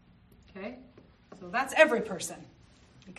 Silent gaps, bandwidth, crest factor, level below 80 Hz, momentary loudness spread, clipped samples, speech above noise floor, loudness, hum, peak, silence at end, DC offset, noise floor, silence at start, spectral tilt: none; 13 kHz; 26 dB; -64 dBFS; 25 LU; under 0.1%; 30 dB; -27 LUFS; 60 Hz at -60 dBFS; -8 dBFS; 0.05 s; under 0.1%; -58 dBFS; 0.55 s; -3 dB/octave